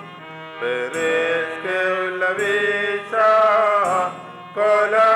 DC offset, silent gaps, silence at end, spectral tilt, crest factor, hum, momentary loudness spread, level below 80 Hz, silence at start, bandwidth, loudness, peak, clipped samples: under 0.1%; none; 0 s; -3.5 dB/octave; 12 dB; none; 14 LU; -70 dBFS; 0 s; 12.5 kHz; -19 LUFS; -8 dBFS; under 0.1%